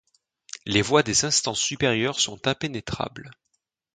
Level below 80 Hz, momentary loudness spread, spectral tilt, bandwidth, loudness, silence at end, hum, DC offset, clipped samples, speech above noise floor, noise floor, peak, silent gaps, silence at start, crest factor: -54 dBFS; 14 LU; -3 dB/octave; 9.6 kHz; -23 LUFS; 0.6 s; none; under 0.1%; under 0.1%; 34 dB; -58 dBFS; -4 dBFS; none; 0.65 s; 22 dB